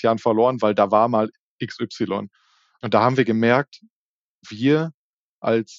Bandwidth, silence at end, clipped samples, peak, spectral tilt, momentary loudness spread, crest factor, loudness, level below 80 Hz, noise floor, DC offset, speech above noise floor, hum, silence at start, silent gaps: 7.6 kHz; 0.05 s; under 0.1%; -2 dBFS; -5 dB/octave; 15 LU; 20 dB; -20 LUFS; -72 dBFS; -67 dBFS; under 0.1%; 47 dB; none; 0 s; 1.39-1.59 s, 3.90-4.41 s, 4.94-5.42 s